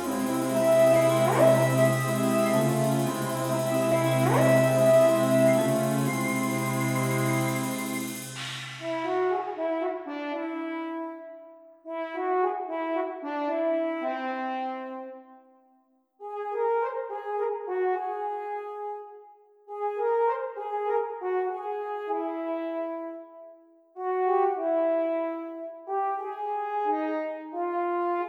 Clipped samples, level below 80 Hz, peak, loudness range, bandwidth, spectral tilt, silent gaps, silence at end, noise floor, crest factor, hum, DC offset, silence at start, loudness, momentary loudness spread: under 0.1%; -72 dBFS; -8 dBFS; 9 LU; 19 kHz; -6 dB/octave; none; 0 s; -66 dBFS; 18 dB; none; under 0.1%; 0 s; -27 LUFS; 15 LU